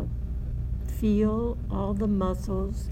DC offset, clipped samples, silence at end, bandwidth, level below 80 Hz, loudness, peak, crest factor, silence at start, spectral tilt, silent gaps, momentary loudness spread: under 0.1%; under 0.1%; 0 s; 15.5 kHz; -32 dBFS; -28 LUFS; -14 dBFS; 14 dB; 0 s; -9 dB/octave; none; 9 LU